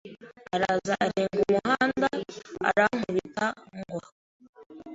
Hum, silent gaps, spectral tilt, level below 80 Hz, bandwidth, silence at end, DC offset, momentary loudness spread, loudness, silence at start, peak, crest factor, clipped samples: none; 4.12-4.40 s, 4.49-4.53 s, 4.66-4.70 s; -5 dB/octave; -62 dBFS; 8 kHz; 0 s; under 0.1%; 16 LU; -27 LUFS; 0.05 s; -8 dBFS; 20 dB; under 0.1%